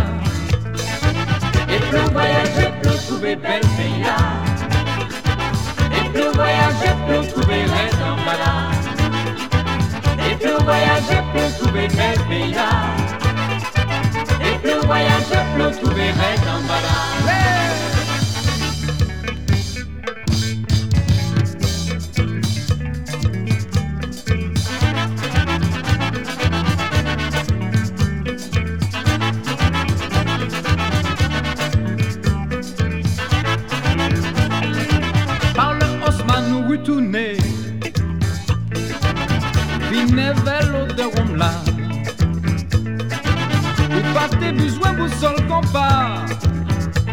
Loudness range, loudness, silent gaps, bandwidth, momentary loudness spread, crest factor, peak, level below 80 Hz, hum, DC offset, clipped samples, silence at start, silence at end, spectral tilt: 3 LU; -19 LUFS; none; 16.5 kHz; 6 LU; 16 dB; -2 dBFS; -30 dBFS; none; 1%; under 0.1%; 0 s; 0 s; -5.5 dB/octave